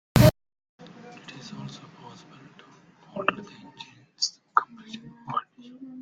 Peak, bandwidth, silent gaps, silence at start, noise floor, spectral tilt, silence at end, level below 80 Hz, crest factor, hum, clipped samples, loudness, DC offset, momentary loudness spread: -2 dBFS; 13.5 kHz; 0.69-0.79 s; 0.15 s; -54 dBFS; -5.5 dB/octave; 0 s; -46 dBFS; 28 dB; none; under 0.1%; -26 LUFS; under 0.1%; 25 LU